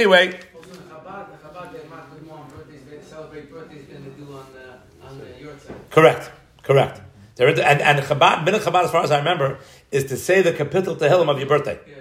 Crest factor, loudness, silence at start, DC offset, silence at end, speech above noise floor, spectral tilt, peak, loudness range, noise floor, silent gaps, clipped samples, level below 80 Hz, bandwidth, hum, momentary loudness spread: 20 dB; -18 LUFS; 0 s; under 0.1%; 0 s; 24 dB; -5 dB/octave; 0 dBFS; 22 LU; -43 dBFS; none; under 0.1%; -58 dBFS; 16 kHz; none; 25 LU